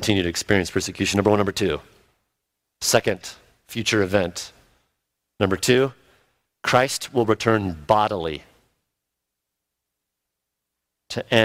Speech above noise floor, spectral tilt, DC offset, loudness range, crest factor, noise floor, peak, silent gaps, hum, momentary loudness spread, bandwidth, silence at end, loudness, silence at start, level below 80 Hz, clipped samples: 61 dB; -4 dB/octave; under 0.1%; 6 LU; 22 dB; -82 dBFS; 0 dBFS; none; 60 Hz at -60 dBFS; 13 LU; 16 kHz; 0 s; -22 LUFS; 0 s; -54 dBFS; under 0.1%